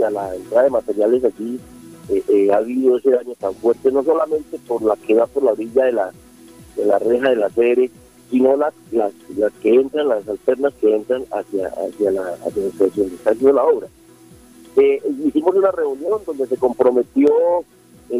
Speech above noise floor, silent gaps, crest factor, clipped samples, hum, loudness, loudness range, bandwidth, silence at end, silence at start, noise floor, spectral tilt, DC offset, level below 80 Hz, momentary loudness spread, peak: 28 dB; none; 16 dB; under 0.1%; none; -18 LUFS; 2 LU; 15 kHz; 0 s; 0 s; -45 dBFS; -6.5 dB/octave; under 0.1%; -56 dBFS; 8 LU; -2 dBFS